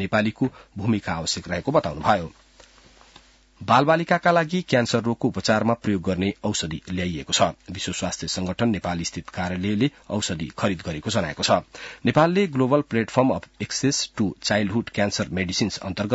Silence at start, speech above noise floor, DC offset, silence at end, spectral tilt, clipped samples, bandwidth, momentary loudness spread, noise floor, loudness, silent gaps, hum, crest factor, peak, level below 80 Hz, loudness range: 0 s; 30 dB; under 0.1%; 0 s; -4.5 dB/octave; under 0.1%; 8 kHz; 9 LU; -53 dBFS; -23 LUFS; none; none; 18 dB; -6 dBFS; -52 dBFS; 4 LU